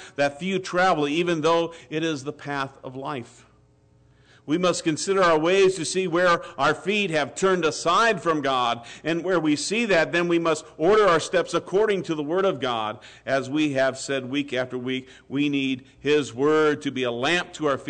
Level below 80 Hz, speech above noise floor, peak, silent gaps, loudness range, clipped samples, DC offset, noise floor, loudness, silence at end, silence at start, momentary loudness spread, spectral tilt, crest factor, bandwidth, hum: -60 dBFS; 35 dB; -12 dBFS; none; 5 LU; under 0.1%; under 0.1%; -58 dBFS; -23 LUFS; 0 s; 0 s; 10 LU; -4.5 dB/octave; 12 dB; 9.4 kHz; none